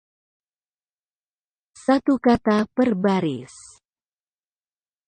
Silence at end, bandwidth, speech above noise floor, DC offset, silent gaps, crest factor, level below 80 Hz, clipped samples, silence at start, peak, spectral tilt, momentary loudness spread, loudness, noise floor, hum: 1.6 s; 9.8 kHz; over 70 dB; under 0.1%; none; 18 dB; -56 dBFS; under 0.1%; 1.9 s; -6 dBFS; -6.5 dB/octave; 11 LU; -21 LUFS; under -90 dBFS; none